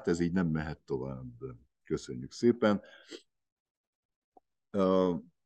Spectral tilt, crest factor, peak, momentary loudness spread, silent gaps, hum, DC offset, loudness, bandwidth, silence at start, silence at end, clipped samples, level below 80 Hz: -7 dB/octave; 22 dB; -12 dBFS; 20 LU; 3.52-4.09 s, 4.16-4.32 s; none; under 0.1%; -32 LUFS; 9 kHz; 0 s; 0.25 s; under 0.1%; -60 dBFS